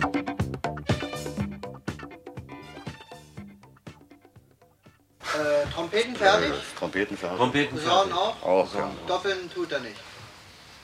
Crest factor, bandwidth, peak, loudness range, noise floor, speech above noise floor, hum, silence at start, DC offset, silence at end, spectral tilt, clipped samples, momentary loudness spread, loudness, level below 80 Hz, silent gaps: 24 dB; 15.5 kHz; -6 dBFS; 17 LU; -58 dBFS; 33 dB; none; 0 s; under 0.1%; 0 s; -4.5 dB/octave; under 0.1%; 23 LU; -27 LUFS; -52 dBFS; none